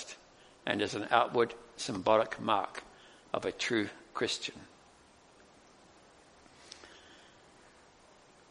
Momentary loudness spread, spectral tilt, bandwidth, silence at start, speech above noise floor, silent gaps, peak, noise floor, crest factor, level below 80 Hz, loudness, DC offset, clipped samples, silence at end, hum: 23 LU; -3.5 dB/octave; 10.5 kHz; 0 s; 29 dB; none; -10 dBFS; -61 dBFS; 26 dB; -70 dBFS; -33 LUFS; under 0.1%; under 0.1%; 1.35 s; none